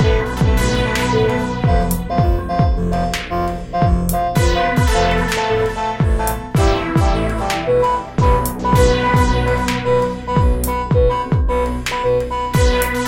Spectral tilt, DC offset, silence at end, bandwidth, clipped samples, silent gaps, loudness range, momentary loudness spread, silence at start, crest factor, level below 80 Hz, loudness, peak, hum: -6 dB/octave; under 0.1%; 0 s; 17 kHz; under 0.1%; none; 2 LU; 4 LU; 0 s; 16 dB; -22 dBFS; -17 LUFS; 0 dBFS; none